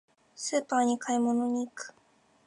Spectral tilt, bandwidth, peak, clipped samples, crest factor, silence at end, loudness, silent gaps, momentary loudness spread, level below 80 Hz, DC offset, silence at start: -3 dB/octave; 11 kHz; -14 dBFS; under 0.1%; 16 dB; 0.55 s; -29 LUFS; none; 13 LU; -82 dBFS; under 0.1%; 0.4 s